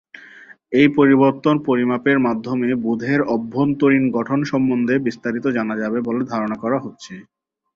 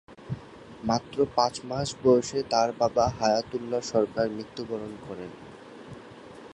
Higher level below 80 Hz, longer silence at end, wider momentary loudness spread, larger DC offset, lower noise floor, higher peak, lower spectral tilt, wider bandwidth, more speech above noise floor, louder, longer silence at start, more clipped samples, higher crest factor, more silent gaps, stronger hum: second, -60 dBFS vs -54 dBFS; first, 0.55 s vs 0 s; second, 9 LU vs 21 LU; neither; about the same, -44 dBFS vs -46 dBFS; first, -2 dBFS vs -8 dBFS; first, -7.5 dB/octave vs -5 dB/octave; second, 7.2 kHz vs 11 kHz; first, 26 dB vs 19 dB; first, -18 LUFS vs -27 LUFS; about the same, 0.15 s vs 0.1 s; neither; about the same, 16 dB vs 20 dB; neither; neither